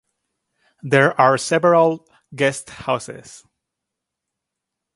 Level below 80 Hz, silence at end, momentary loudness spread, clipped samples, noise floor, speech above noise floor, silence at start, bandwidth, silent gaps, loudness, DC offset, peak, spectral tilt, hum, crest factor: -62 dBFS; 1.6 s; 19 LU; under 0.1%; -82 dBFS; 64 dB; 0.85 s; 11.5 kHz; none; -18 LUFS; under 0.1%; 0 dBFS; -5 dB/octave; none; 20 dB